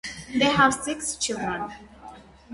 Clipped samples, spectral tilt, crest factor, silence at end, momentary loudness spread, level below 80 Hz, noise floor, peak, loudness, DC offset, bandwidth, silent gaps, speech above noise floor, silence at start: under 0.1%; -3 dB/octave; 20 dB; 0 s; 19 LU; -52 dBFS; -46 dBFS; -6 dBFS; -24 LUFS; under 0.1%; 11.5 kHz; none; 22 dB; 0.05 s